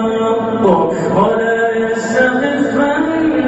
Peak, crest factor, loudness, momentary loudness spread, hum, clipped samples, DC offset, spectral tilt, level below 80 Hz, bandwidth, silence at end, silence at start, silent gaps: 0 dBFS; 12 dB; -14 LUFS; 3 LU; none; under 0.1%; under 0.1%; -6 dB/octave; -46 dBFS; 8.2 kHz; 0 s; 0 s; none